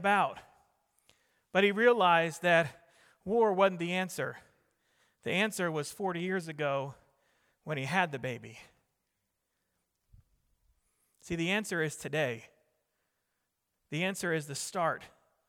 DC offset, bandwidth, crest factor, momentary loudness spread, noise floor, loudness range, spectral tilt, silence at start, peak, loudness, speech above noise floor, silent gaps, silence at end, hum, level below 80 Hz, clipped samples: under 0.1%; 17 kHz; 22 dB; 15 LU; -83 dBFS; 10 LU; -4.5 dB/octave; 0 s; -12 dBFS; -31 LUFS; 52 dB; none; 0.4 s; none; -70 dBFS; under 0.1%